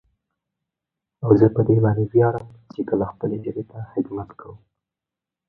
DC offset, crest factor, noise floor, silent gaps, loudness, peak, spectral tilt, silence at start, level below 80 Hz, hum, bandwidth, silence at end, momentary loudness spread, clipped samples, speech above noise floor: under 0.1%; 22 dB; -87 dBFS; none; -21 LUFS; 0 dBFS; -12.5 dB/octave; 1.2 s; -52 dBFS; none; 4.8 kHz; 0.95 s; 16 LU; under 0.1%; 67 dB